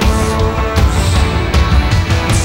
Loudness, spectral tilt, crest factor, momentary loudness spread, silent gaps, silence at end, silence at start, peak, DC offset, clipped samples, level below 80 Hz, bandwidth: -13 LUFS; -5.5 dB/octave; 12 dB; 2 LU; none; 0 s; 0 s; 0 dBFS; 0.9%; under 0.1%; -16 dBFS; 16.5 kHz